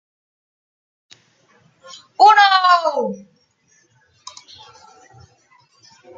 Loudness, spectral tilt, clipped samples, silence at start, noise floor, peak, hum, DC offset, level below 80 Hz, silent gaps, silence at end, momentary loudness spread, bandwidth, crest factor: -13 LUFS; -2 dB/octave; under 0.1%; 2.2 s; -60 dBFS; -2 dBFS; none; under 0.1%; -76 dBFS; none; 3 s; 28 LU; 7.8 kHz; 20 dB